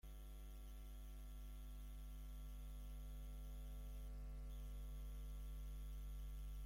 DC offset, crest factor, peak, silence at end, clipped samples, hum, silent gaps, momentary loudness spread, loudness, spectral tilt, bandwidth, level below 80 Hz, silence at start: under 0.1%; 8 dB; -44 dBFS; 0 s; under 0.1%; none; none; 4 LU; -56 LUFS; -5.5 dB/octave; 16.5 kHz; -52 dBFS; 0.05 s